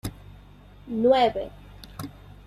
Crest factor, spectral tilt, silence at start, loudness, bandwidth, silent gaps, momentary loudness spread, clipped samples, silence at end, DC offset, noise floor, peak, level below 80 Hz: 20 dB; -6 dB/octave; 0.05 s; -23 LUFS; 16 kHz; none; 22 LU; under 0.1%; 0.35 s; under 0.1%; -49 dBFS; -8 dBFS; -50 dBFS